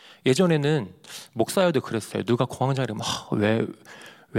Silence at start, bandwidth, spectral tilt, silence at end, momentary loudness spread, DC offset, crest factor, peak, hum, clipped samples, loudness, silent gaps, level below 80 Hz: 0.25 s; 16.5 kHz; -5.5 dB/octave; 0 s; 17 LU; under 0.1%; 18 dB; -6 dBFS; none; under 0.1%; -24 LUFS; none; -66 dBFS